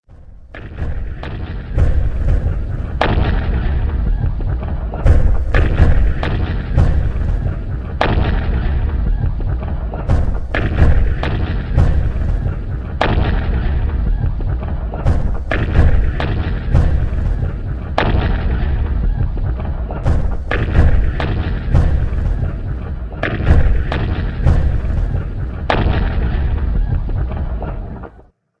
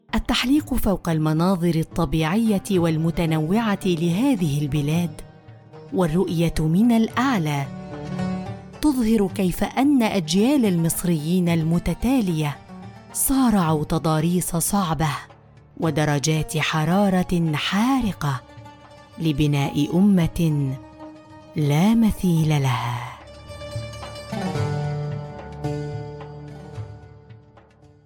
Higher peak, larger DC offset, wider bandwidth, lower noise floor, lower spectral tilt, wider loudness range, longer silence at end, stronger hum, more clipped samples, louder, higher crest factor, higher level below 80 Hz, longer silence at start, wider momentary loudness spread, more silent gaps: first, 0 dBFS vs -8 dBFS; neither; second, 6 kHz vs 18 kHz; second, -45 dBFS vs -51 dBFS; first, -8.5 dB/octave vs -6 dB/octave; second, 2 LU vs 6 LU; second, 0.5 s vs 0.7 s; neither; neither; first, -19 LUFS vs -22 LUFS; about the same, 14 dB vs 12 dB; first, -18 dBFS vs -40 dBFS; about the same, 0.1 s vs 0.15 s; second, 10 LU vs 15 LU; neither